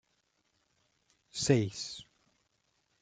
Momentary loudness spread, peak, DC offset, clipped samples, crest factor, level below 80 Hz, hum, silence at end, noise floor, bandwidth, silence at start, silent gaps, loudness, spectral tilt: 16 LU; -12 dBFS; under 0.1%; under 0.1%; 26 dB; -72 dBFS; none; 1 s; -77 dBFS; 9.6 kHz; 1.35 s; none; -32 LUFS; -5 dB/octave